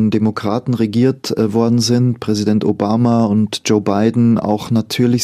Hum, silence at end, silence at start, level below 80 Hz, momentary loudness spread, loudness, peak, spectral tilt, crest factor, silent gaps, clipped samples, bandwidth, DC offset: none; 0 s; 0 s; -52 dBFS; 4 LU; -15 LUFS; 0 dBFS; -6.5 dB/octave; 14 dB; none; under 0.1%; 14.5 kHz; under 0.1%